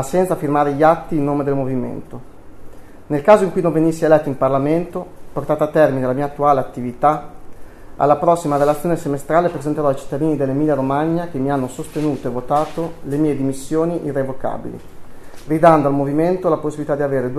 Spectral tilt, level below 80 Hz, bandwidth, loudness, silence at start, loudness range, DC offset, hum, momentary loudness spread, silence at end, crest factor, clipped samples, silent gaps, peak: -7.5 dB/octave; -42 dBFS; 13.5 kHz; -18 LUFS; 0 s; 4 LU; under 0.1%; none; 11 LU; 0 s; 18 dB; under 0.1%; none; 0 dBFS